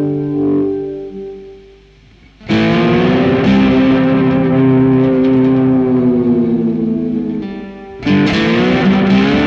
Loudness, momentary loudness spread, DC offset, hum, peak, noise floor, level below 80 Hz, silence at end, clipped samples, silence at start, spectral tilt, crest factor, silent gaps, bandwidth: -12 LUFS; 13 LU; under 0.1%; none; -2 dBFS; -43 dBFS; -38 dBFS; 0 s; under 0.1%; 0 s; -8 dB/octave; 10 dB; none; 7 kHz